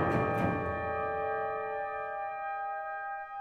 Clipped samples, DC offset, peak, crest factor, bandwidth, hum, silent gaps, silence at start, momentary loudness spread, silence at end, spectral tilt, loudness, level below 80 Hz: under 0.1%; under 0.1%; -16 dBFS; 18 dB; 15 kHz; none; none; 0 s; 7 LU; 0 s; -8 dB/octave; -34 LUFS; -58 dBFS